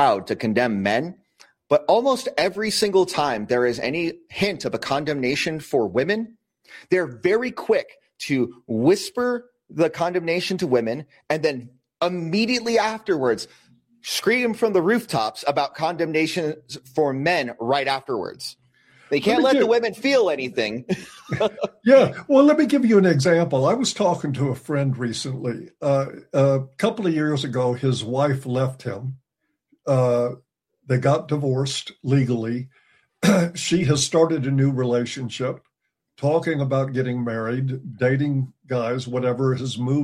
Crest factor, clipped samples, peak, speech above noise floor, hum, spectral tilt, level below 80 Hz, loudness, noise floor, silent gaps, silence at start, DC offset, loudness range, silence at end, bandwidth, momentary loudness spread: 18 dB; under 0.1%; -2 dBFS; 56 dB; none; -5.5 dB/octave; -60 dBFS; -22 LUFS; -77 dBFS; none; 0 s; under 0.1%; 5 LU; 0 s; 15.5 kHz; 10 LU